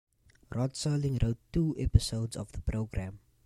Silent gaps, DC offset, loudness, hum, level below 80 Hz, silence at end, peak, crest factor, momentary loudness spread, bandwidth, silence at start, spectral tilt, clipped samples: none; under 0.1%; -32 LUFS; none; -38 dBFS; 0.3 s; -8 dBFS; 24 dB; 10 LU; 13 kHz; 0.5 s; -6.5 dB/octave; under 0.1%